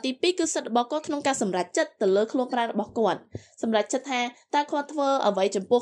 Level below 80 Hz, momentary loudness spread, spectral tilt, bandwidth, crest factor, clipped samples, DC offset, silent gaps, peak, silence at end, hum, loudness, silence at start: -70 dBFS; 5 LU; -3.5 dB/octave; 11.5 kHz; 16 dB; under 0.1%; under 0.1%; none; -10 dBFS; 0 s; none; -26 LUFS; 0.05 s